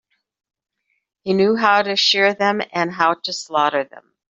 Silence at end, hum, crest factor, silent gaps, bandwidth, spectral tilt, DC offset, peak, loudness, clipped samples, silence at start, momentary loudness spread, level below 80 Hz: 0.35 s; none; 18 dB; none; 8.2 kHz; -3.5 dB/octave; under 0.1%; -2 dBFS; -17 LUFS; under 0.1%; 1.25 s; 10 LU; -68 dBFS